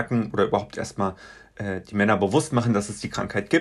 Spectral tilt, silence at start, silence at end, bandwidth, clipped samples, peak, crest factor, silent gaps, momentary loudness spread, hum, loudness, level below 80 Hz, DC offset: -6 dB/octave; 0 s; 0 s; 12 kHz; under 0.1%; -6 dBFS; 18 dB; none; 11 LU; none; -25 LUFS; -54 dBFS; under 0.1%